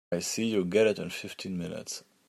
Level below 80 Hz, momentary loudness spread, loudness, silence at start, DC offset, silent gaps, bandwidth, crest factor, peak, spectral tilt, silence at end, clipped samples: -70 dBFS; 12 LU; -30 LUFS; 0.1 s; under 0.1%; none; 15.5 kHz; 18 dB; -12 dBFS; -4.5 dB/octave; 0.3 s; under 0.1%